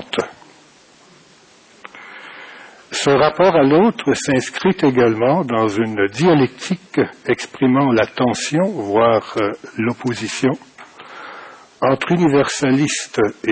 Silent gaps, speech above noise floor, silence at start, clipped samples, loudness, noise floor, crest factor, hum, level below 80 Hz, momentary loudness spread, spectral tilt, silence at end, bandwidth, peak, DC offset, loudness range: none; 32 dB; 0 s; under 0.1%; -17 LUFS; -48 dBFS; 14 dB; none; -54 dBFS; 20 LU; -5.5 dB/octave; 0 s; 8 kHz; -4 dBFS; under 0.1%; 5 LU